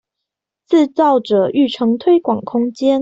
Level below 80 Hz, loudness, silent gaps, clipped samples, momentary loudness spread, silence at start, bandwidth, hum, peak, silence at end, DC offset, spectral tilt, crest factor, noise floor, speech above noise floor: -62 dBFS; -15 LUFS; none; under 0.1%; 5 LU; 0.7 s; 7.8 kHz; none; -2 dBFS; 0 s; under 0.1%; -6.5 dB/octave; 12 dB; -81 dBFS; 67 dB